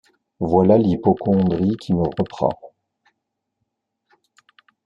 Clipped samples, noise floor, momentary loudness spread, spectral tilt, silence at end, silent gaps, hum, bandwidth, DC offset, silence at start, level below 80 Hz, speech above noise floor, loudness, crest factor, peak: under 0.1%; -78 dBFS; 9 LU; -10 dB/octave; 2.2 s; none; none; 7.2 kHz; under 0.1%; 0.4 s; -52 dBFS; 60 dB; -19 LUFS; 18 dB; -2 dBFS